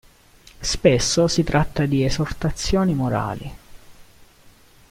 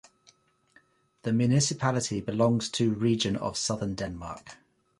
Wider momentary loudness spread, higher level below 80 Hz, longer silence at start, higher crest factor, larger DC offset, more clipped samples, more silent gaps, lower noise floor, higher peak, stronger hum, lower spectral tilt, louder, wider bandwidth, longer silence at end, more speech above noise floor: about the same, 11 LU vs 12 LU; first, -36 dBFS vs -56 dBFS; second, 0.6 s vs 1.25 s; about the same, 20 dB vs 18 dB; neither; neither; neither; second, -51 dBFS vs -64 dBFS; first, -2 dBFS vs -10 dBFS; neither; about the same, -5 dB/octave vs -5 dB/octave; first, -21 LUFS vs -28 LUFS; first, 16 kHz vs 11.5 kHz; first, 0.65 s vs 0.45 s; second, 31 dB vs 36 dB